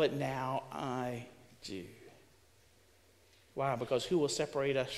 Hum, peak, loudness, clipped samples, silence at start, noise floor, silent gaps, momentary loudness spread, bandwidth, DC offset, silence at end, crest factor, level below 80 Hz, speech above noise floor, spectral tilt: none; -18 dBFS; -36 LUFS; under 0.1%; 0 s; -66 dBFS; none; 17 LU; 15.5 kHz; under 0.1%; 0 s; 18 dB; -68 dBFS; 31 dB; -5 dB/octave